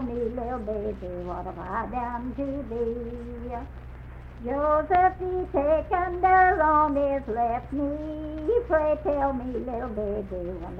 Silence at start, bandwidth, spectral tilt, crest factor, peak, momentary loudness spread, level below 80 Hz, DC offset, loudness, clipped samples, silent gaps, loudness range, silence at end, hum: 0 s; 5.6 kHz; -9 dB/octave; 18 dB; -8 dBFS; 15 LU; -40 dBFS; under 0.1%; -26 LUFS; under 0.1%; none; 10 LU; 0 s; none